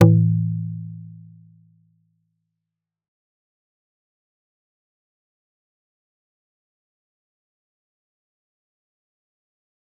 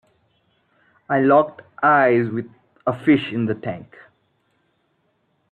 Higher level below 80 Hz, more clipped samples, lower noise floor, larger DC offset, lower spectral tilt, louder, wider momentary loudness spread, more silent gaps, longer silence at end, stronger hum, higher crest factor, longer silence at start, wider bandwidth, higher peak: about the same, -62 dBFS vs -64 dBFS; neither; first, -85 dBFS vs -67 dBFS; neither; about the same, -10 dB/octave vs -9 dB/octave; about the same, -21 LUFS vs -19 LUFS; first, 23 LU vs 15 LU; neither; first, 8.9 s vs 1.65 s; neither; first, 26 dB vs 18 dB; second, 0 s vs 1.1 s; second, 3.2 kHz vs 4.4 kHz; about the same, -2 dBFS vs -4 dBFS